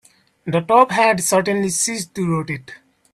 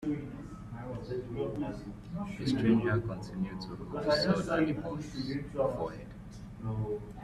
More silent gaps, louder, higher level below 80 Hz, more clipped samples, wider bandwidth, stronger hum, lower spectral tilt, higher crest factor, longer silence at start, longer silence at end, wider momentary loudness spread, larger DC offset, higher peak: neither; first, -18 LUFS vs -34 LUFS; second, -58 dBFS vs -52 dBFS; neither; first, 16 kHz vs 13 kHz; neither; second, -4 dB/octave vs -7 dB/octave; about the same, 18 dB vs 18 dB; first, 0.45 s vs 0 s; first, 0.35 s vs 0 s; second, 12 LU vs 16 LU; neither; first, 0 dBFS vs -16 dBFS